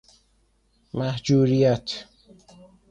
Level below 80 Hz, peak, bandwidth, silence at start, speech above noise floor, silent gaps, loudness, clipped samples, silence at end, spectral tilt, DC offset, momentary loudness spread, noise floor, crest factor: -56 dBFS; -8 dBFS; 8.8 kHz; 0.95 s; 44 dB; none; -23 LUFS; under 0.1%; 0.85 s; -7 dB/octave; under 0.1%; 16 LU; -65 dBFS; 16 dB